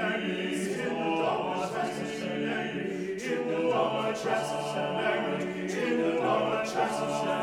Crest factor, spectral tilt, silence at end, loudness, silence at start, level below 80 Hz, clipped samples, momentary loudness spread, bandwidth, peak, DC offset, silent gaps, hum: 16 dB; -5 dB/octave; 0 s; -30 LUFS; 0 s; -68 dBFS; under 0.1%; 5 LU; 16.5 kHz; -14 dBFS; under 0.1%; none; none